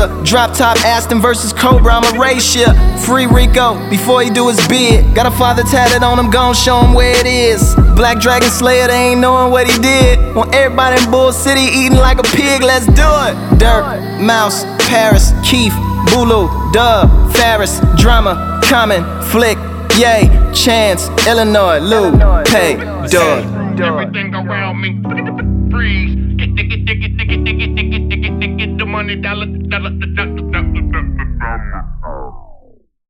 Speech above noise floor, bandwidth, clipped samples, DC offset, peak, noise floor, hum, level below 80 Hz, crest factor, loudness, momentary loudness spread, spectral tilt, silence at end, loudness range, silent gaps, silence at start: 34 dB; 18 kHz; 0.1%; under 0.1%; 0 dBFS; -44 dBFS; none; -16 dBFS; 10 dB; -11 LUFS; 9 LU; -4.5 dB/octave; 0.55 s; 7 LU; none; 0 s